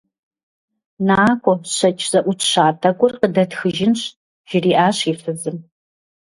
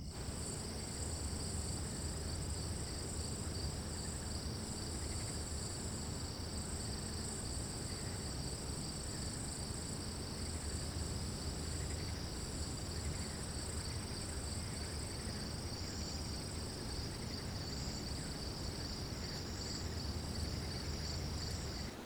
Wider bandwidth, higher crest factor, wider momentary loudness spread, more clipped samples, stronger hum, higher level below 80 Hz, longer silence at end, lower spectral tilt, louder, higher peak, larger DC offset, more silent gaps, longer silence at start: second, 11.5 kHz vs over 20 kHz; about the same, 18 dB vs 14 dB; first, 10 LU vs 1 LU; neither; neither; second, -56 dBFS vs -48 dBFS; first, 0.7 s vs 0 s; about the same, -4.5 dB/octave vs -4 dB/octave; first, -17 LUFS vs -42 LUFS; first, 0 dBFS vs -28 dBFS; neither; first, 4.16-4.44 s vs none; first, 1 s vs 0 s